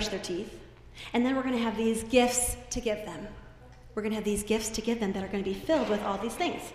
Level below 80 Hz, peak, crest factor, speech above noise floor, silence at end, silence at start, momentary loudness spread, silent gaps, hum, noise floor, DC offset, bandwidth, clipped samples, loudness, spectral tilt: -48 dBFS; -10 dBFS; 20 dB; 20 dB; 0 s; 0 s; 15 LU; none; none; -50 dBFS; under 0.1%; 15.5 kHz; under 0.1%; -30 LUFS; -3.5 dB/octave